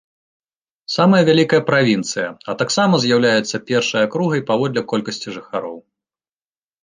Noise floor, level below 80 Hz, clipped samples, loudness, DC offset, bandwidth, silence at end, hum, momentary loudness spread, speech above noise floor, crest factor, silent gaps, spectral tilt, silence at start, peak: under -90 dBFS; -62 dBFS; under 0.1%; -17 LUFS; under 0.1%; 9.8 kHz; 1.05 s; none; 13 LU; over 73 dB; 16 dB; none; -5 dB/octave; 0.9 s; -2 dBFS